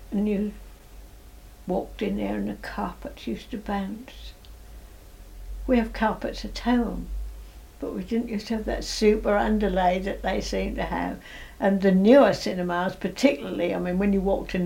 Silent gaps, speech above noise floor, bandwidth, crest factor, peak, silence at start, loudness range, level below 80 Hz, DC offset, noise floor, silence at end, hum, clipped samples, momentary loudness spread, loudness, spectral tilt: none; 22 dB; 17 kHz; 20 dB; -6 dBFS; 0 s; 10 LU; -40 dBFS; under 0.1%; -46 dBFS; 0 s; none; under 0.1%; 16 LU; -25 LUFS; -6 dB/octave